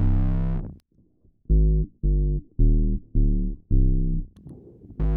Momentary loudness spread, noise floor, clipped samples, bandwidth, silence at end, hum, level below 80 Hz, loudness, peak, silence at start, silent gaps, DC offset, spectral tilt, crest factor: 20 LU; -60 dBFS; under 0.1%; 2.2 kHz; 0 s; none; -24 dBFS; -26 LUFS; -8 dBFS; 0 s; none; under 0.1%; -12.5 dB/octave; 14 dB